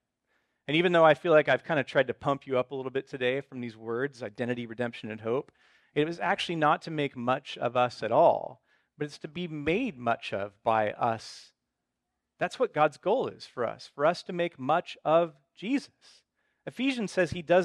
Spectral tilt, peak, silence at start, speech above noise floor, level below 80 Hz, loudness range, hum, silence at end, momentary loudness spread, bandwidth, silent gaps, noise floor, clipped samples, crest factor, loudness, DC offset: -6 dB/octave; -8 dBFS; 0.7 s; 56 dB; -66 dBFS; 6 LU; none; 0 s; 14 LU; 11 kHz; none; -84 dBFS; under 0.1%; 20 dB; -29 LUFS; under 0.1%